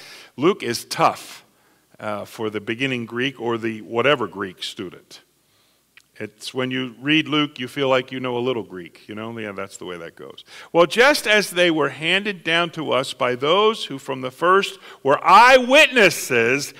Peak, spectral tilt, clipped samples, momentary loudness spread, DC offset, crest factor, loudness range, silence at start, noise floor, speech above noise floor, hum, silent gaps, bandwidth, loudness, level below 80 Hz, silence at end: -2 dBFS; -3.5 dB/octave; under 0.1%; 20 LU; under 0.1%; 18 dB; 10 LU; 0 s; -61 dBFS; 41 dB; none; none; 16 kHz; -19 LUFS; -60 dBFS; 0.1 s